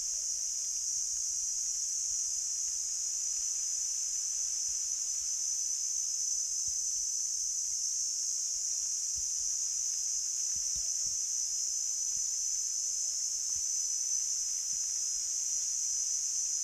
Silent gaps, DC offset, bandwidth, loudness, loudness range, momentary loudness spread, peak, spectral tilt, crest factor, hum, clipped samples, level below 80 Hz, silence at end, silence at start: none; under 0.1%; over 20 kHz; -31 LUFS; 1 LU; 1 LU; -20 dBFS; 4 dB/octave; 14 dB; none; under 0.1%; -66 dBFS; 0 s; 0 s